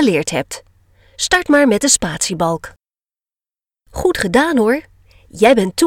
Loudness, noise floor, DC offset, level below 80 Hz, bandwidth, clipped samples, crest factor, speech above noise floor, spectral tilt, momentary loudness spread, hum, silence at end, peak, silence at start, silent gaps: -15 LUFS; under -90 dBFS; under 0.1%; -42 dBFS; 17 kHz; under 0.1%; 16 dB; over 75 dB; -3.5 dB/octave; 11 LU; none; 0 s; 0 dBFS; 0 s; none